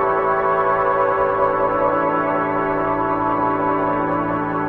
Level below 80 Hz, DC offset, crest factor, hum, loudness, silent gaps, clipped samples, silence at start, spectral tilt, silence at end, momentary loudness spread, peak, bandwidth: -46 dBFS; under 0.1%; 12 dB; none; -19 LUFS; none; under 0.1%; 0 s; -9 dB/octave; 0 s; 2 LU; -6 dBFS; 5.2 kHz